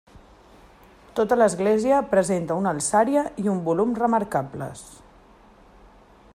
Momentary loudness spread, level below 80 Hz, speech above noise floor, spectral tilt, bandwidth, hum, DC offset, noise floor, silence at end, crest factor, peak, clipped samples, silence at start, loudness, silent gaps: 12 LU; -56 dBFS; 30 dB; -5.5 dB/octave; 15 kHz; none; under 0.1%; -52 dBFS; 1.4 s; 18 dB; -6 dBFS; under 0.1%; 0.15 s; -22 LUFS; none